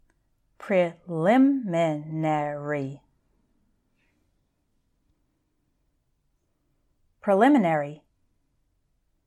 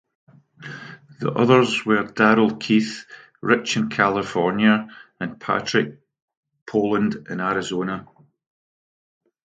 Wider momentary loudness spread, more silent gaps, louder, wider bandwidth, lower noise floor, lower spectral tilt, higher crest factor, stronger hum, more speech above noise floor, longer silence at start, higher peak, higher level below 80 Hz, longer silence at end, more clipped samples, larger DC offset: second, 12 LU vs 19 LU; second, none vs 6.22-6.28 s, 6.37-6.43 s, 6.62-6.66 s; second, -24 LUFS vs -21 LUFS; first, 10.5 kHz vs 9.2 kHz; first, -72 dBFS vs -40 dBFS; first, -7.5 dB/octave vs -5.5 dB/octave; about the same, 20 dB vs 22 dB; neither; first, 50 dB vs 20 dB; about the same, 0.6 s vs 0.6 s; second, -8 dBFS vs 0 dBFS; second, -70 dBFS vs -62 dBFS; about the same, 1.3 s vs 1.4 s; neither; neither